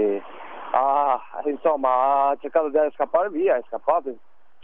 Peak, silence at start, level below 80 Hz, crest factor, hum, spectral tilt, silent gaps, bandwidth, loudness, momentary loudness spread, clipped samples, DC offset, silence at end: -6 dBFS; 0 s; -76 dBFS; 16 dB; none; -8 dB/octave; none; 3.8 kHz; -22 LUFS; 9 LU; under 0.1%; 0.8%; 0.5 s